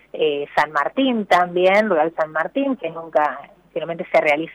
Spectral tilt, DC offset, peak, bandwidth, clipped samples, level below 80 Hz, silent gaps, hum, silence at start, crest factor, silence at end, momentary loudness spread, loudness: -5.5 dB/octave; under 0.1%; -6 dBFS; 14.5 kHz; under 0.1%; -62 dBFS; none; none; 0.15 s; 14 dB; 0 s; 11 LU; -19 LUFS